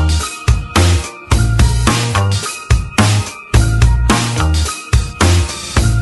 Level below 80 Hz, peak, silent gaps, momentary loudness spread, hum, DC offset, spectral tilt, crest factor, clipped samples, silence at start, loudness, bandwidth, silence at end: -18 dBFS; 0 dBFS; none; 5 LU; none; under 0.1%; -4.5 dB/octave; 12 dB; under 0.1%; 0 s; -14 LUFS; 12 kHz; 0 s